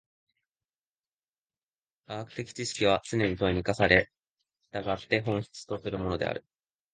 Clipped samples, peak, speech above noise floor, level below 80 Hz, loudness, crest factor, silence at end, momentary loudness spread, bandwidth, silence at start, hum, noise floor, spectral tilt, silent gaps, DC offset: under 0.1%; -4 dBFS; over 61 dB; -52 dBFS; -29 LUFS; 28 dB; 0.55 s; 16 LU; 9.8 kHz; 2.1 s; none; under -90 dBFS; -5 dB/octave; none; under 0.1%